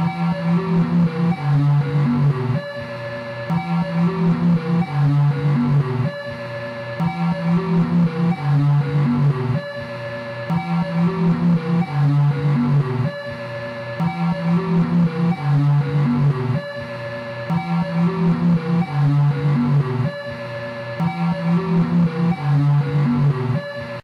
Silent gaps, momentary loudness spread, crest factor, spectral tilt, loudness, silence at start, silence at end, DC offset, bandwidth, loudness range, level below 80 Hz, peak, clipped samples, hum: none; 11 LU; 8 dB; -9.5 dB/octave; -20 LUFS; 0 s; 0.05 s; under 0.1%; 5.8 kHz; 1 LU; -50 dBFS; -10 dBFS; under 0.1%; none